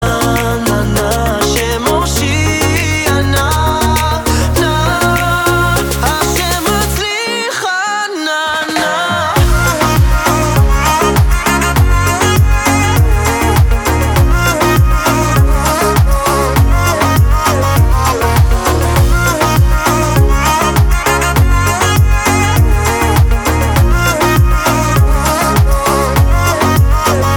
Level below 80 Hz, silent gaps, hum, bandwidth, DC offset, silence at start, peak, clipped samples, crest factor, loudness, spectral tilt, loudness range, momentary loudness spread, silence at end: -16 dBFS; none; none; 19.5 kHz; under 0.1%; 0 s; 0 dBFS; under 0.1%; 10 dB; -11 LUFS; -4.5 dB/octave; 2 LU; 3 LU; 0 s